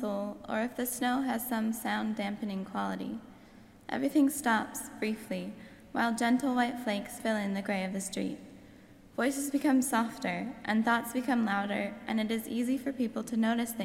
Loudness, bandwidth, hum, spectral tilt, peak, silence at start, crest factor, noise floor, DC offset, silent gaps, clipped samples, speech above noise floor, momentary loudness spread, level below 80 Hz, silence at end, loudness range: -32 LUFS; 16.5 kHz; none; -4.5 dB/octave; -16 dBFS; 0 s; 16 dB; -55 dBFS; under 0.1%; none; under 0.1%; 24 dB; 11 LU; -66 dBFS; 0 s; 3 LU